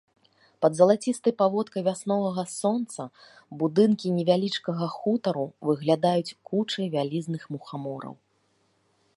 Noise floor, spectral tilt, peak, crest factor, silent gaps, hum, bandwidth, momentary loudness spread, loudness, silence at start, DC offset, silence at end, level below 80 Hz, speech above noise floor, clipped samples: -69 dBFS; -6 dB/octave; -6 dBFS; 22 dB; none; none; 11.5 kHz; 14 LU; -26 LUFS; 0.6 s; under 0.1%; 1 s; -76 dBFS; 43 dB; under 0.1%